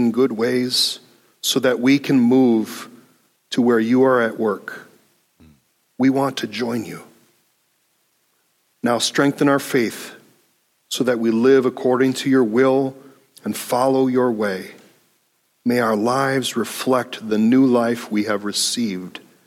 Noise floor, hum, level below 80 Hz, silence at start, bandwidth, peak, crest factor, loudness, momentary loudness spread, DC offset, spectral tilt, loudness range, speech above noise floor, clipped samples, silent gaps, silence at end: -65 dBFS; none; -70 dBFS; 0 s; 16 kHz; -4 dBFS; 16 dB; -19 LUFS; 14 LU; under 0.1%; -4.5 dB/octave; 7 LU; 47 dB; under 0.1%; none; 0.3 s